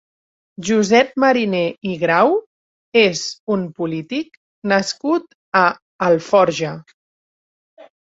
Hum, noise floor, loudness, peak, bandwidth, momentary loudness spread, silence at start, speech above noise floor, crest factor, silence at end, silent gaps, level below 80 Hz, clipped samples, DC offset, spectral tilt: none; under -90 dBFS; -18 LUFS; 0 dBFS; 7.8 kHz; 12 LU; 0.6 s; over 73 dB; 18 dB; 0.2 s; 2.46-2.92 s, 3.40-3.47 s, 4.37-4.62 s, 5.35-5.52 s, 5.82-5.99 s, 6.94-7.77 s; -60 dBFS; under 0.1%; under 0.1%; -4.5 dB/octave